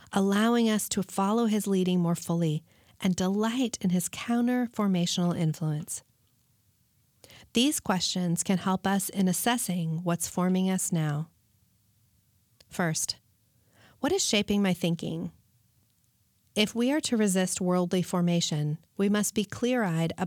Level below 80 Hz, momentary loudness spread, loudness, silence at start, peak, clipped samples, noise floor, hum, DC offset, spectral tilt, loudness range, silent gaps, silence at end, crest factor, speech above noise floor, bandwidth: -64 dBFS; 7 LU; -28 LUFS; 0.1 s; -12 dBFS; under 0.1%; -69 dBFS; none; under 0.1%; -4.5 dB/octave; 4 LU; none; 0 s; 16 dB; 42 dB; 19 kHz